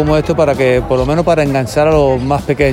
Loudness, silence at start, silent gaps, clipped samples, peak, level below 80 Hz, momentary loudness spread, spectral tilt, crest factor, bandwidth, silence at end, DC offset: -13 LUFS; 0 s; none; under 0.1%; 0 dBFS; -28 dBFS; 3 LU; -7 dB/octave; 12 dB; 16.5 kHz; 0 s; under 0.1%